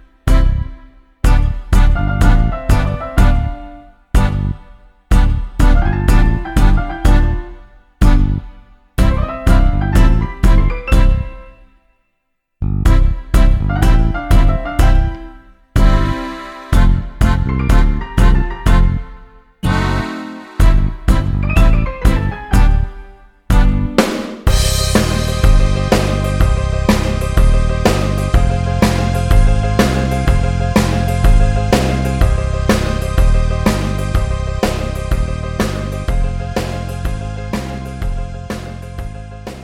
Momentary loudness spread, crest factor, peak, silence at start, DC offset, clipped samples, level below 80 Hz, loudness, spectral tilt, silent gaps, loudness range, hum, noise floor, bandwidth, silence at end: 10 LU; 12 dB; 0 dBFS; 0.25 s; under 0.1%; under 0.1%; -14 dBFS; -16 LUFS; -6 dB/octave; none; 3 LU; none; -68 dBFS; 14.5 kHz; 0 s